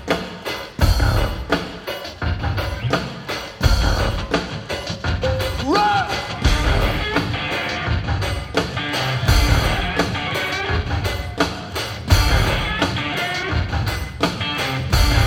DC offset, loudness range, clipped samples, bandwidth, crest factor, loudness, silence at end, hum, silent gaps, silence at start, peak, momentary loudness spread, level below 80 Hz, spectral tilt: under 0.1%; 2 LU; under 0.1%; 17 kHz; 18 dB; -21 LUFS; 0 s; none; none; 0 s; 0 dBFS; 8 LU; -24 dBFS; -5 dB/octave